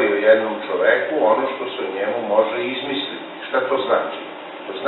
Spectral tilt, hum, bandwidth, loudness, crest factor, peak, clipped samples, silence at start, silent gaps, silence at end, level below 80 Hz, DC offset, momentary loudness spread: -8 dB/octave; none; 4.2 kHz; -20 LUFS; 18 dB; -2 dBFS; under 0.1%; 0 s; none; 0 s; -72 dBFS; under 0.1%; 14 LU